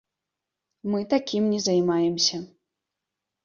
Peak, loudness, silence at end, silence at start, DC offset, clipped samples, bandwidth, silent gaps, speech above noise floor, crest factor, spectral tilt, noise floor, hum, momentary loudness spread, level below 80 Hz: -8 dBFS; -24 LUFS; 1 s; 0.85 s; under 0.1%; under 0.1%; 7.4 kHz; none; 62 dB; 18 dB; -4.5 dB/octave; -86 dBFS; none; 9 LU; -68 dBFS